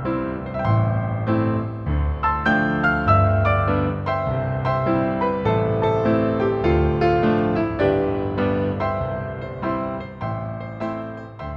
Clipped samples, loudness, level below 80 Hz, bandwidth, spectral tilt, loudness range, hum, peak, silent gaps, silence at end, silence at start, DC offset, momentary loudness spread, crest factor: under 0.1%; -21 LUFS; -34 dBFS; 6 kHz; -9.5 dB/octave; 4 LU; none; -4 dBFS; none; 0 s; 0 s; under 0.1%; 10 LU; 16 dB